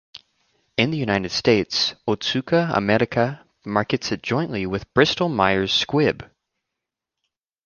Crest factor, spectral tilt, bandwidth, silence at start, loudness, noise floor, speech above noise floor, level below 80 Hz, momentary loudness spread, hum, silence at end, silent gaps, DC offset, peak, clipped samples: 22 dB; -5 dB/octave; 7.2 kHz; 0.8 s; -21 LUFS; -84 dBFS; 63 dB; -50 dBFS; 7 LU; none; 1.4 s; none; under 0.1%; -2 dBFS; under 0.1%